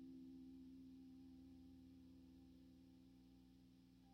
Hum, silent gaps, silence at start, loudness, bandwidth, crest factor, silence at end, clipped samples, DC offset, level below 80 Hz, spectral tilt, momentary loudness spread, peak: 60 Hz at -75 dBFS; none; 0 s; -64 LUFS; 6.6 kHz; 12 dB; 0 s; under 0.1%; under 0.1%; -78 dBFS; -7.5 dB/octave; 8 LU; -52 dBFS